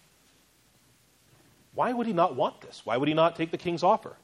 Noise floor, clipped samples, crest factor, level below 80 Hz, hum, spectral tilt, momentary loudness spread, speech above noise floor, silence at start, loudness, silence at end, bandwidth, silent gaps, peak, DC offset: -63 dBFS; under 0.1%; 18 dB; -70 dBFS; none; -6.5 dB/octave; 7 LU; 36 dB; 1.75 s; -27 LUFS; 0.1 s; 12.5 kHz; none; -10 dBFS; under 0.1%